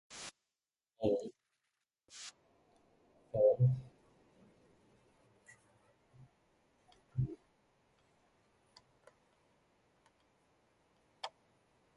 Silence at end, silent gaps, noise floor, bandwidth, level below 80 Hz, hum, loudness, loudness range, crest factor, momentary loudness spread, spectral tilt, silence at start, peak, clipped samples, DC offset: 0.7 s; none; under -90 dBFS; 11.5 kHz; -68 dBFS; none; -36 LUFS; 15 LU; 24 dB; 21 LU; -7 dB/octave; 0.1 s; -18 dBFS; under 0.1%; under 0.1%